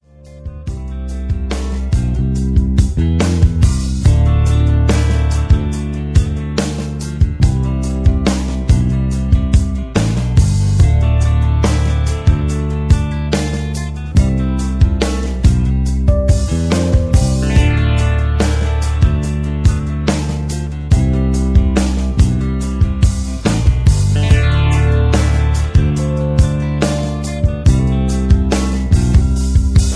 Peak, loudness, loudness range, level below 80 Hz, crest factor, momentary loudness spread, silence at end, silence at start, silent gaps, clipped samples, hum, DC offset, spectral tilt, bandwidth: 0 dBFS; -15 LUFS; 2 LU; -16 dBFS; 12 dB; 6 LU; 0 s; 0.2 s; none; under 0.1%; none; under 0.1%; -6.5 dB/octave; 11 kHz